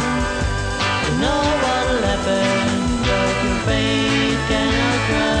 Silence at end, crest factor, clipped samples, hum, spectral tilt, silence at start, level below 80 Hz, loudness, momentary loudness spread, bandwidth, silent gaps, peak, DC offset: 0 s; 12 dB; under 0.1%; none; -4.5 dB/octave; 0 s; -30 dBFS; -18 LUFS; 3 LU; 10.5 kHz; none; -6 dBFS; under 0.1%